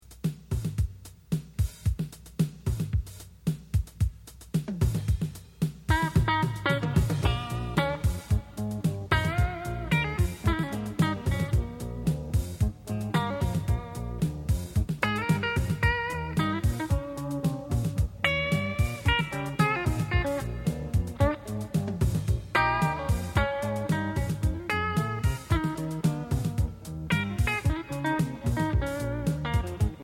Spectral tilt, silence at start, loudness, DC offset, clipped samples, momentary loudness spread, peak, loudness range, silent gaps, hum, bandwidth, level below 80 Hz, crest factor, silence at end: -6 dB/octave; 0.1 s; -29 LUFS; under 0.1%; under 0.1%; 7 LU; -10 dBFS; 3 LU; none; none; 17 kHz; -36 dBFS; 18 dB; 0 s